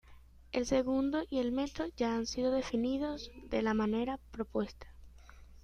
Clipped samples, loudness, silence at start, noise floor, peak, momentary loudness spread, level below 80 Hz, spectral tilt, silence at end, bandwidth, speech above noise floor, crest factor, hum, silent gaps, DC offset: under 0.1%; -35 LUFS; 0.05 s; -56 dBFS; -18 dBFS; 8 LU; -54 dBFS; -5 dB/octave; 0 s; 10 kHz; 23 dB; 18 dB; none; none; under 0.1%